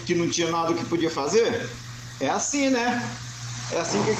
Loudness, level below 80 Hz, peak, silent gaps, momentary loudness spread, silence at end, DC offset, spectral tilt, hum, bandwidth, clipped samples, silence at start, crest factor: -25 LUFS; -56 dBFS; -10 dBFS; none; 12 LU; 0 s; under 0.1%; -4 dB/octave; none; 14.5 kHz; under 0.1%; 0 s; 16 dB